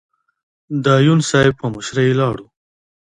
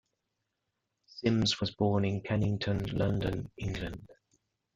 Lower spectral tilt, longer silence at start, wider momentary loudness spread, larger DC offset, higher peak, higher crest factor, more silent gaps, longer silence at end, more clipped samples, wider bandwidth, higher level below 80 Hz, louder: about the same, -6 dB/octave vs -6 dB/octave; second, 0.7 s vs 1.15 s; about the same, 12 LU vs 10 LU; neither; first, 0 dBFS vs -14 dBFS; about the same, 16 dB vs 18 dB; neither; about the same, 0.6 s vs 0.6 s; neither; first, 10.5 kHz vs 7.8 kHz; about the same, -50 dBFS vs -52 dBFS; first, -16 LUFS vs -32 LUFS